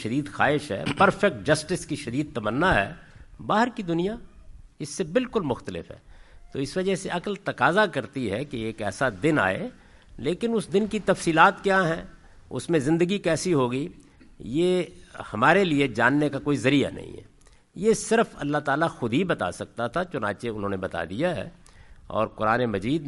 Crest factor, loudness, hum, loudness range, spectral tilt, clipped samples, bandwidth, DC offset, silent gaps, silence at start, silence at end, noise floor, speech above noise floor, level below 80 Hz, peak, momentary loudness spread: 22 dB; -25 LUFS; none; 5 LU; -5.5 dB/octave; under 0.1%; 11.5 kHz; under 0.1%; none; 0 s; 0 s; -46 dBFS; 22 dB; -50 dBFS; -2 dBFS; 12 LU